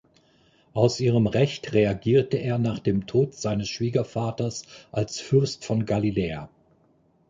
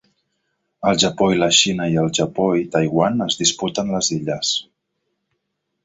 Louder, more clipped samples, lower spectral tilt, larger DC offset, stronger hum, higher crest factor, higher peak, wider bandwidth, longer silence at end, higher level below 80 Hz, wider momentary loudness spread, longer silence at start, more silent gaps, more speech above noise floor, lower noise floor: second, -25 LUFS vs -18 LUFS; neither; first, -6.5 dB/octave vs -3.5 dB/octave; neither; neither; about the same, 20 dB vs 18 dB; about the same, -4 dBFS vs -2 dBFS; about the same, 9 kHz vs 8.2 kHz; second, 0.8 s vs 1.25 s; about the same, -52 dBFS vs -54 dBFS; about the same, 9 LU vs 7 LU; about the same, 0.75 s vs 0.8 s; neither; second, 39 dB vs 57 dB; second, -63 dBFS vs -75 dBFS